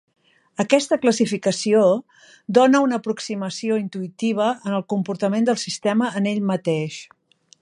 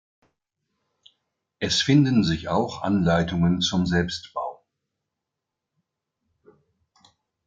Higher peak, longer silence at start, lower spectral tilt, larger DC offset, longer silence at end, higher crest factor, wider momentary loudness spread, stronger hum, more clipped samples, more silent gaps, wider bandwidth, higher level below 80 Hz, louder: first, -2 dBFS vs -6 dBFS; second, 0.6 s vs 1.6 s; about the same, -5 dB/octave vs -5.5 dB/octave; neither; second, 0.55 s vs 2.95 s; about the same, 20 dB vs 20 dB; second, 10 LU vs 13 LU; neither; neither; neither; first, 11.5 kHz vs 7.8 kHz; second, -72 dBFS vs -52 dBFS; about the same, -21 LUFS vs -23 LUFS